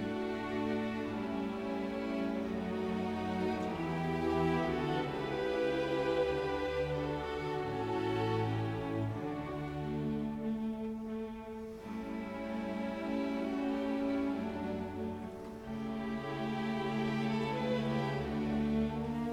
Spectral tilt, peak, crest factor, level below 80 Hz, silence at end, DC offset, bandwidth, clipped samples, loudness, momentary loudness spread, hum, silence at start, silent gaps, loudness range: -7.5 dB/octave; -20 dBFS; 14 dB; -56 dBFS; 0 s; under 0.1%; 13.5 kHz; under 0.1%; -36 LUFS; 7 LU; none; 0 s; none; 5 LU